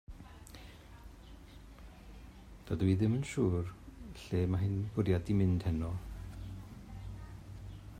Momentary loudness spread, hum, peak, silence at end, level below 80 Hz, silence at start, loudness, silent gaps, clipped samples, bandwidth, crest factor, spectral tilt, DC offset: 23 LU; none; -18 dBFS; 0 s; -52 dBFS; 0.1 s; -34 LUFS; none; under 0.1%; 12 kHz; 18 dB; -8 dB/octave; under 0.1%